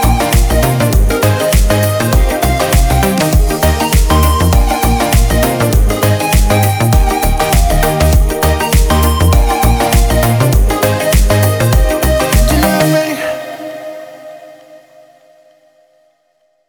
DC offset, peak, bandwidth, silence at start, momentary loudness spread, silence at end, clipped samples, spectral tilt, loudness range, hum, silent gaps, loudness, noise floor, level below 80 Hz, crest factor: under 0.1%; 0 dBFS; over 20 kHz; 0 s; 3 LU; 1.9 s; under 0.1%; -5 dB/octave; 4 LU; none; none; -11 LUFS; -58 dBFS; -14 dBFS; 10 dB